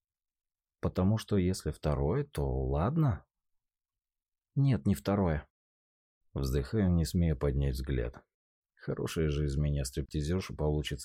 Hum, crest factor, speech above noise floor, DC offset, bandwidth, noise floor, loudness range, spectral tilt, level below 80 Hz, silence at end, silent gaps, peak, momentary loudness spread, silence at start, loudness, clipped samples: none; 14 dB; over 59 dB; under 0.1%; 16 kHz; under -90 dBFS; 2 LU; -7 dB/octave; -42 dBFS; 0 s; 5.50-6.21 s, 8.34-8.62 s; -18 dBFS; 9 LU; 0.85 s; -32 LUFS; under 0.1%